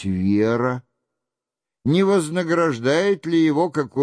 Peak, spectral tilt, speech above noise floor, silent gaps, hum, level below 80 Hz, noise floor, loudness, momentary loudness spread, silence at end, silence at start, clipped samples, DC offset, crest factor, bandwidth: -8 dBFS; -6.5 dB/octave; 68 dB; none; none; -58 dBFS; -87 dBFS; -20 LUFS; 5 LU; 0 s; 0 s; under 0.1%; under 0.1%; 12 dB; 11 kHz